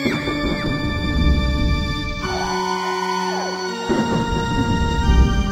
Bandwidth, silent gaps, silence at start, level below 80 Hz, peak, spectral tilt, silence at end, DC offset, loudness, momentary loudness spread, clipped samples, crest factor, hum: 15.5 kHz; none; 0 s; -24 dBFS; -4 dBFS; -5.5 dB/octave; 0 s; under 0.1%; -21 LUFS; 6 LU; under 0.1%; 14 dB; none